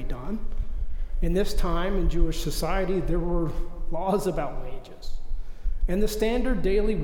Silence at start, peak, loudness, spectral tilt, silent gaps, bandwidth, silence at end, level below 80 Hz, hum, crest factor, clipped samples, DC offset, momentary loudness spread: 0 s; -8 dBFS; -28 LUFS; -6 dB/octave; none; 15.5 kHz; 0 s; -26 dBFS; none; 14 dB; under 0.1%; under 0.1%; 14 LU